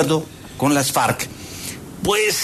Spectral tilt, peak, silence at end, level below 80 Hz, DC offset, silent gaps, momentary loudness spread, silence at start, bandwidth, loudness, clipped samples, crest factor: -3.5 dB/octave; -4 dBFS; 0 s; -48 dBFS; under 0.1%; none; 13 LU; 0 s; 14 kHz; -20 LUFS; under 0.1%; 16 dB